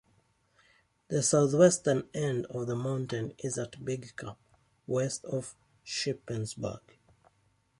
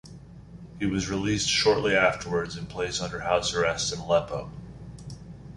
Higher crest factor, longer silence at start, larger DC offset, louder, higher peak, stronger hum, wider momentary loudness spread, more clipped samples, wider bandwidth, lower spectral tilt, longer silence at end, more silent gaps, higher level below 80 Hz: about the same, 24 dB vs 20 dB; first, 1.1 s vs 0.05 s; neither; second, -31 LUFS vs -26 LUFS; about the same, -8 dBFS vs -6 dBFS; neither; second, 18 LU vs 22 LU; neither; about the same, 11.5 kHz vs 11.5 kHz; first, -5 dB/octave vs -3.5 dB/octave; first, 1 s vs 0 s; neither; second, -66 dBFS vs -48 dBFS